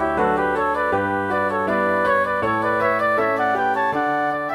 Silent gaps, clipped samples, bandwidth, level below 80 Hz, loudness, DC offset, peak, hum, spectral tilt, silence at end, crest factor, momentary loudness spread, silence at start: none; under 0.1%; 15.5 kHz; -50 dBFS; -20 LUFS; under 0.1%; -6 dBFS; none; -6.5 dB/octave; 0 s; 14 dB; 3 LU; 0 s